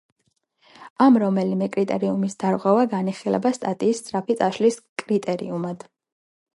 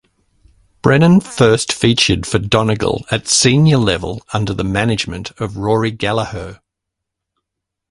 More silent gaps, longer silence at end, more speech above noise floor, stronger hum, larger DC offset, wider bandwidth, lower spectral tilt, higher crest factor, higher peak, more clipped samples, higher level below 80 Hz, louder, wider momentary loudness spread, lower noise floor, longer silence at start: first, 0.90-0.96 s, 4.89-4.96 s vs none; second, 0.75 s vs 1.35 s; second, 45 dB vs 65 dB; neither; neither; about the same, 11.5 kHz vs 11.5 kHz; first, -6.5 dB/octave vs -4.5 dB/octave; about the same, 18 dB vs 16 dB; second, -4 dBFS vs 0 dBFS; neither; second, -70 dBFS vs -38 dBFS; second, -22 LUFS vs -15 LUFS; about the same, 10 LU vs 11 LU; second, -66 dBFS vs -79 dBFS; about the same, 0.8 s vs 0.85 s